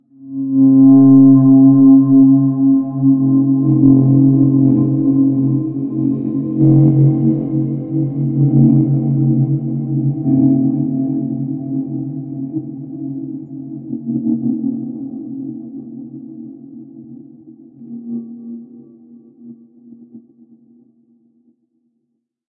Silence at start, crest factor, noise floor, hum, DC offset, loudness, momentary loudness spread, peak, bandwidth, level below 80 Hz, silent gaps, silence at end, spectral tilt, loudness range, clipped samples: 0.2 s; 14 dB; -71 dBFS; none; under 0.1%; -13 LUFS; 21 LU; 0 dBFS; 1.3 kHz; -52 dBFS; none; 2.3 s; -16 dB/octave; 23 LU; under 0.1%